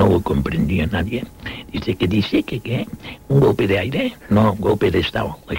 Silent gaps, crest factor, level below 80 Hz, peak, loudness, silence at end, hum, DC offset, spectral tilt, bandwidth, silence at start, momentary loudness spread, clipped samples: none; 16 dB; -36 dBFS; -4 dBFS; -19 LUFS; 0 s; none; 0.1%; -7.5 dB/octave; 16.5 kHz; 0 s; 11 LU; under 0.1%